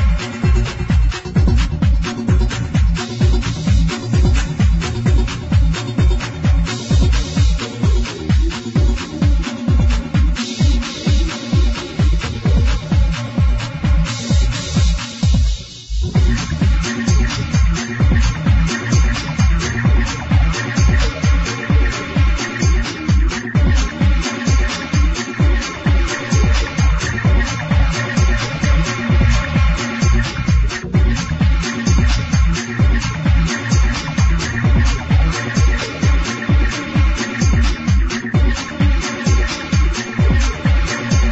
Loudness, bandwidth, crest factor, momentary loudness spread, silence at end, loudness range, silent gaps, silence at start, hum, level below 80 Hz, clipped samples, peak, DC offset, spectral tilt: -17 LUFS; 8.2 kHz; 12 dB; 3 LU; 0 s; 1 LU; none; 0 s; none; -18 dBFS; under 0.1%; -2 dBFS; under 0.1%; -5.5 dB/octave